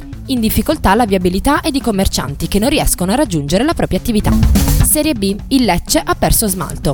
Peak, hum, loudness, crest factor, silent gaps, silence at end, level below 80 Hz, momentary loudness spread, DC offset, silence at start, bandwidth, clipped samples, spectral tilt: 0 dBFS; none; -14 LUFS; 14 dB; none; 0 s; -22 dBFS; 5 LU; under 0.1%; 0 s; 19.5 kHz; under 0.1%; -4.5 dB/octave